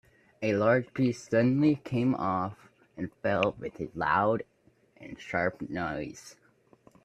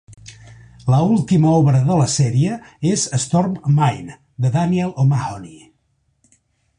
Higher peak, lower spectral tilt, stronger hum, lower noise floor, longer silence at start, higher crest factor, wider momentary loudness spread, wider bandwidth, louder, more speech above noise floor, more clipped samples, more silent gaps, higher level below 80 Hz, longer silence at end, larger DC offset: second, -8 dBFS vs -4 dBFS; about the same, -7 dB/octave vs -6.5 dB/octave; neither; second, -61 dBFS vs -65 dBFS; first, 0.4 s vs 0.1 s; first, 22 dB vs 14 dB; first, 15 LU vs 9 LU; about the same, 10.5 kHz vs 10.5 kHz; second, -29 LUFS vs -17 LUFS; second, 33 dB vs 49 dB; neither; neither; second, -62 dBFS vs -48 dBFS; second, 0.7 s vs 1.25 s; neither